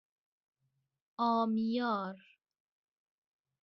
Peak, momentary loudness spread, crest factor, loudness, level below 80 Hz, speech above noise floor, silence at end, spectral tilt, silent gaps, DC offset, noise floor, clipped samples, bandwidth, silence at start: -20 dBFS; 19 LU; 18 dB; -33 LUFS; -82 dBFS; 49 dB; 1.45 s; -4.5 dB/octave; none; under 0.1%; -82 dBFS; under 0.1%; 6 kHz; 1.2 s